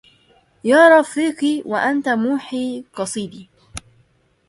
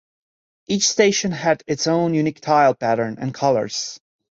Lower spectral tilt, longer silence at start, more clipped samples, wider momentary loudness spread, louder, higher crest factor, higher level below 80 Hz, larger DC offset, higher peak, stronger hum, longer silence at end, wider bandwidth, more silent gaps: about the same, -4 dB/octave vs -4 dB/octave; about the same, 0.65 s vs 0.7 s; neither; first, 24 LU vs 10 LU; about the same, -17 LUFS vs -19 LUFS; about the same, 18 dB vs 18 dB; about the same, -56 dBFS vs -60 dBFS; neither; first, 0 dBFS vs -4 dBFS; neither; first, 0.7 s vs 0.35 s; first, 11.5 kHz vs 8 kHz; neither